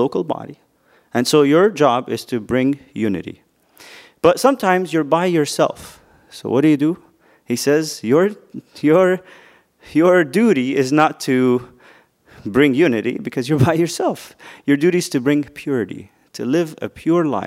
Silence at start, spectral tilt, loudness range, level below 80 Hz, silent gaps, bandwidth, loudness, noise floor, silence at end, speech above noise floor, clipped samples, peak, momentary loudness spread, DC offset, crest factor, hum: 0 s; -5.5 dB/octave; 3 LU; -56 dBFS; none; 16 kHz; -17 LUFS; -50 dBFS; 0 s; 33 dB; under 0.1%; 0 dBFS; 14 LU; under 0.1%; 18 dB; none